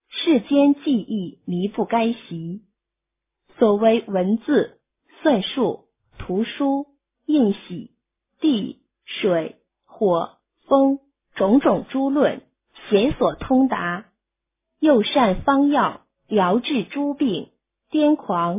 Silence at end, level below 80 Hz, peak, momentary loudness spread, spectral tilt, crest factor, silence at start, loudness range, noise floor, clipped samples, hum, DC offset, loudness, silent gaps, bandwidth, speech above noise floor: 0 s; -50 dBFS; -4 dBFS; 15 LU; -10.5 dB/octave; 18 dB; 0.15 s; 4 LU; -84 dBFS; under 0.1%; none; under 0.1%; -21 LUFS; none; 3.8 kHz; 64 dB